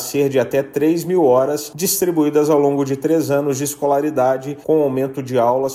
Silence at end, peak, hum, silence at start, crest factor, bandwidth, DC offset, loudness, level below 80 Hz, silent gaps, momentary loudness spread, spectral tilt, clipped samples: 0 s; -4 dBFS; none; 0 s; 12 dB; 16 kHz; under 0.1%; -17 LUFS; -60 dBFS; none; 6 LU; -5.5 dB/octave; under 0.1%